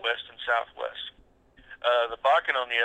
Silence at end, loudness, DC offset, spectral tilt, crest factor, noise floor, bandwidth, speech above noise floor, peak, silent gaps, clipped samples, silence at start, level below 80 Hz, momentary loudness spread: 0 s; -27 LUFS; under 0.1%; -1.5 dB/octave; 18 dB; -58 dBFS; 8.8 kHz; 31 dB; -10 dBFS; none; under 0.1%; 0 s; -64 dBFS; 12 LU